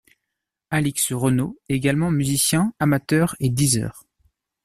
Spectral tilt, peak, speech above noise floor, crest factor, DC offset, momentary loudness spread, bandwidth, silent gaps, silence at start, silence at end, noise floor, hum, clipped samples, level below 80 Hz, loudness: -4.5 dB/octave; -6 dBFS; 62 dB; 16 dB; under 0.1%; 5 LU; 14.5 kHz; none; 0.7 s; 0.65 s; -82 dBFS; none; under 0.1%; -50 dBFS; -21 LUFS